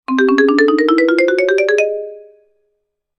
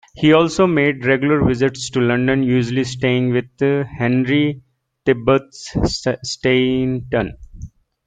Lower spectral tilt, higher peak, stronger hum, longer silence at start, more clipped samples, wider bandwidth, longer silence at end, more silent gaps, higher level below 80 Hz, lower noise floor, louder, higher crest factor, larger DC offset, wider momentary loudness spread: second, -3 dB/octave vs -6 dB/octave; about the same, 0 dBFS vs 0 dBFS; neither; about the same, 0.1 s vs 0.15 s; neither; about the same, 10 kHz vs 9.2 kHz; first, 1 s vs 0.4 s; neither; second, -66 dBFS vs -40 dBFS; first, -70 dBFS vs -37 dBFS; first, -13 LUFS vs -17 LUFS; about the same, 14 dB vs 18 dB; neither; about the same, 8 LU vs 7 LU